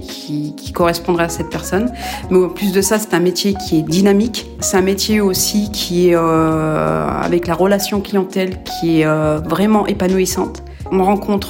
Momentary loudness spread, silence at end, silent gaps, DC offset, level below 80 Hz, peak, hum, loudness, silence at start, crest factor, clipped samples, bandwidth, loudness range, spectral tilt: 8 LU; 0 s; none; under 0.1%; -36 dBFS; -2 dBFS; none; -16 LUFS; 0 s; 14 dB; under 0.1%; 16.5 kHz; 2 LU; -5 dB/octave